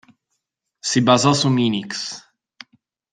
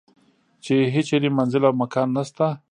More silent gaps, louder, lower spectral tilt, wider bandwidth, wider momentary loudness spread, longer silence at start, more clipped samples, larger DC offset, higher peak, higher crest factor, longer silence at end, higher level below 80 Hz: neither; first, -18 LUFS vs -21 LUFS; second, -4.5 dB/octave vs -7 dB/octave; about the same, 9.8 kHz vs 10 kHz; first, 14 LU vs 5 LU; first, 0.85 s vs 0.65 s; neither; neither; about the same, -2 dBFS vs -4 dBFS; about the same, 20 dB vs 18 dB; first, 0.95 s vs 0.15 s; first, -60 dBFS vs -66 dBFS